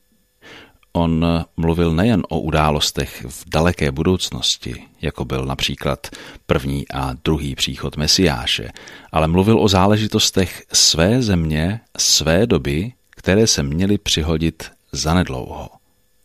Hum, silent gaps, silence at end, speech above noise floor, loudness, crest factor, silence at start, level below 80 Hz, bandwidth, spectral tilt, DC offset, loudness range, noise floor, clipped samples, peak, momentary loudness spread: none; none; 0.55 s; 31 dB; -18 LUFS; 16 dB; 0.45 s; -34 dBFS; 15.5 kHz; -4 dB/octave; under 0.1%; 6 LU; -49 dBFS; under 0.1%; -2 dBFS; 13 LU